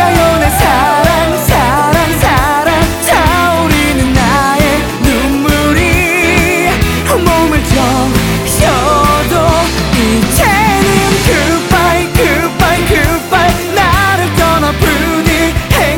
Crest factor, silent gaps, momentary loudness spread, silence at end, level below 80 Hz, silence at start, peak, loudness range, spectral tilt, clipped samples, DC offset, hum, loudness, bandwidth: 10 dB; none; 2 LU; 0 s; -20 dBFS; 0 s; 0 dBFS; 1 LU; -4.5 dB/octave; under 0.1%; under 0.1%; none; -9 LUFS; over 20 kHz